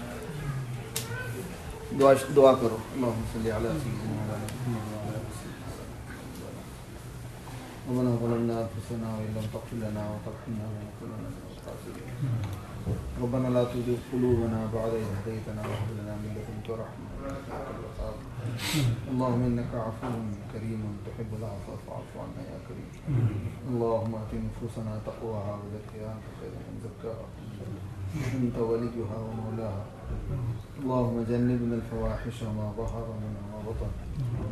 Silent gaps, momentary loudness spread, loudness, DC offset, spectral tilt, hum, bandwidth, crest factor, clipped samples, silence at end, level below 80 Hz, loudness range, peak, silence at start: none; 13 LU; -32 LUFS; under 0.1%; -7 dB/octave; none; 13.5 kHz; 24 dB; under 0.1%; 0 s; -46 dBFS; 10 LU; -6 dBFS; 0 s